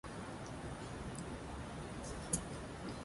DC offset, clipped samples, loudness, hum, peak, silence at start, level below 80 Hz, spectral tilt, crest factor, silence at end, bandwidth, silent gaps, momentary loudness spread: under 0.1%; under 0.1%; -45 LUFS; none; -20 dBFS; 0.05 s; -54 dBFS; -4.5 dB/octave; 24 dB; 0 s; 11.5 kHz; none; 7 LU